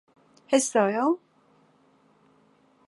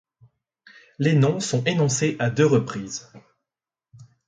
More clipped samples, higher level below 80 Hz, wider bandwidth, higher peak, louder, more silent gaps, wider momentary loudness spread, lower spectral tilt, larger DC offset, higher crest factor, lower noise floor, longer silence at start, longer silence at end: neither; second, -84 dBFS vs -62 dBFS; first, 11.5 kHz vs 9.6 kHz; about the same, -8 dBFS vs -6 dBFS; second, -25 LUFS vs -22 LUFS; neither; second, 5 LU vs 12 LU; second, -3.5 dB/octave vs -5.5 dB/octave; neither; about the same, 22 dB vs 18 dB; second, -62 dBFS vs -89 dBFS; second, 0.5 s vs 1 s; first, 1.7 s vs 0.25 s